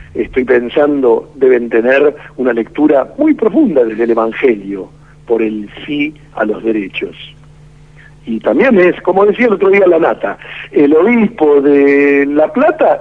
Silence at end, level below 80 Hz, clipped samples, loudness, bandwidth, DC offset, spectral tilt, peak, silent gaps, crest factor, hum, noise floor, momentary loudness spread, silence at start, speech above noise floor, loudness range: 0 s; -46 dBFS; under 0.1%; -11 LUFS; 6 kHz; 0.3%; -8 dB/octave; 0 dBFS; none; 12 dB; none; -39 dBFS; 12 LU; 0 s; 28 dB; 9 LU